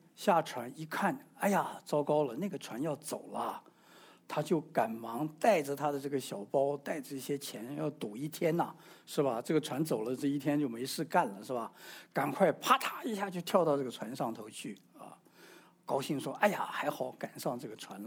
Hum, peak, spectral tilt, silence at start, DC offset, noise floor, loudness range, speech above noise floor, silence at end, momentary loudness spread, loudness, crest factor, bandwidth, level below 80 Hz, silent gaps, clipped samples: none; -10 dBFS; -5 dB/octave; 0.2 s; under 0.1%; -60 dBFS; 4 LU; 26 dB; 0 s; 11 LU; -34 LUFS; 24 dB; over 20 kHz; -86 dBFS; none; under 0.1%